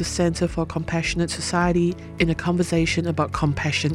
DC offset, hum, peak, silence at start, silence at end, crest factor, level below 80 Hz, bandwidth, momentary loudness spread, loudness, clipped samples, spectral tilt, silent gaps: under 0.1%; none; -6 dBFS; 0 s; 0 s; 16 dB; -38 dBFS; 12.5 kHz; 4 LU; -23 LUFS; under 0.1%; -5 dB/octave; none